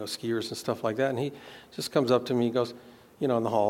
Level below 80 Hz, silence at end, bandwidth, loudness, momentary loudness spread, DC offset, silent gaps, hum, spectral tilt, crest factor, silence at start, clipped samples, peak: -72 dBFS; 0 s; 17 kHz; -29 LUFS; 11 LU; under 0.1%; none; none; -5.5 dB/octave; 20 dB; 0 s; under 0.1%; -10 dBFS